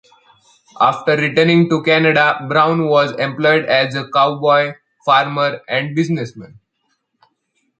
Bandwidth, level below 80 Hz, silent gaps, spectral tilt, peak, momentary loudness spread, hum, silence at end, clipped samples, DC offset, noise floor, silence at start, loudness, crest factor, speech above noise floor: 8.8 kHz; -62 dBFS; none; -6.5 dB/octave; 0 dBFS; 7 LU; none; 1.35 s; under 0.1%; under 0.1%; -68 dBFS; 0.75 s; -15 LUFS; 16 dB; 53 dB